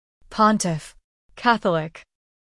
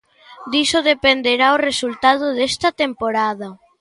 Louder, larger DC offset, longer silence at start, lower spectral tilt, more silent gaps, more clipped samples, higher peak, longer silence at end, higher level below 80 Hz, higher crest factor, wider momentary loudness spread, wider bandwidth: second, -21 LUFS vs -17 LUFS; neither; about the same, 0.3 s vs 0.3 s; first, -4.5 dB/octave vs -2.5 dB/octave; first, 1.04-1.29 s vs none; neither; second, -4 dBFS vs 0 dBFS; first, 0.45 s vs 0.25 s; about the same, -54 dBFS vs -52 dBFS; about the same, 20 dB vs 18 dB; first, 14 LU vs 8 LU; about the same, 12 kHz vs 11.5 kHz